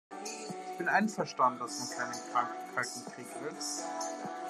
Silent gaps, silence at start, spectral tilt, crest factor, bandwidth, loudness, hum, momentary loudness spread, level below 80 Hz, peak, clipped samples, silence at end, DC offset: none; 0.1 s; -3 dB/octave; 22 dB; 13 kHz; -35 LUFS; none; 12 LU; under -90 dBFS; -14 dBFS; under 0.1%; 0 s; under 0.1%